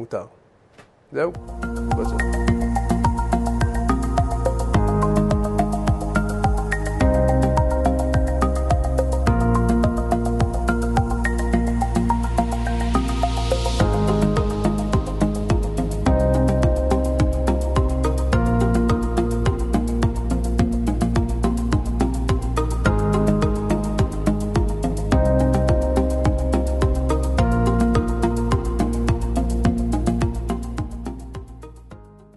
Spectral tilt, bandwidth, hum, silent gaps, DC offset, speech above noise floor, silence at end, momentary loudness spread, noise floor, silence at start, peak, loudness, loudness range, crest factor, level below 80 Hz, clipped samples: -7 dB/octave; 12 kHz; none; none; under 0.1%; 27 dB; 0.3 s; 5 LU; -51 dBFS; 0 s; -6 dBFS; -21 LUFS; 2 LU; 12 dB; -24 dBFS; under 0.1%